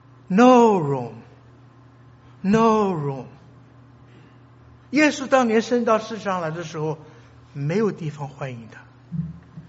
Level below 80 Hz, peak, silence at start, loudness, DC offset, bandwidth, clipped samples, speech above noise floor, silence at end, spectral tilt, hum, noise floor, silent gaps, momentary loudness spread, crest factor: -58 dBFS; -2 dBFS; 0.3 s; -21 LUFS; under 0.1%; 8 kHz; under 0.1%; 29 dB; 0.1 s; -5.5 dB/octave; none; -49 dBFS; none; 19 LU; 20 dB